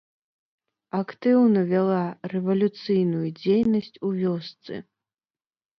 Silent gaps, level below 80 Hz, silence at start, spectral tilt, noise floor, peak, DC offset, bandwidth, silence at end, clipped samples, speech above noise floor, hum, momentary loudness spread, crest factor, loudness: none; -66 dBFS; 0.95 s; -9.5 dB/octave; under -90 dBFS; -10 dBFS; under 0.1%; 6 kHz; 1 s; under 0.1%; over 67 dB; none; 13 LU; 16 dB; -24 LUFS